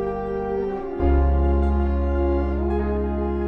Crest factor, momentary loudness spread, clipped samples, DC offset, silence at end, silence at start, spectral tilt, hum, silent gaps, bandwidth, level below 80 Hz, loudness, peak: 12 dB; 6 LU; under 0.1%; under 0.1%; 0 s; 0 s; -11 dB/octave; none; none; 4.1 kHz; -24 dBFS; -23 LUFS; -8 dBFS